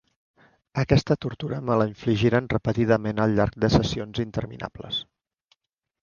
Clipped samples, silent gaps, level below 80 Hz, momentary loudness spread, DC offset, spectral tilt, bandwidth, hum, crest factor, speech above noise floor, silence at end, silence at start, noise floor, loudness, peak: under 0.1%; none; -44 dBFS; 9 LU; under 0.1%; -7 dB/octave; 7.2 kHz; none; 22 dB; 48 dB; 1 s; 0.75 s; -71 dBFS; -24 LUFS; -4 dBFS